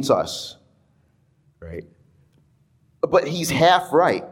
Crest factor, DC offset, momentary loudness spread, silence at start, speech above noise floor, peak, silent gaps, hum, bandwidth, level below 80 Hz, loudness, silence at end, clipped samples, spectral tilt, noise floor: 20 dB; under 0.1%; 21 LU; 0 s; 42 dB; -4 dBFS; none; none; 17 kHz; -56 dBFS; -19 LUFS; 0 s; under 0.1%; -4.5 dB/octave; -61 dBFS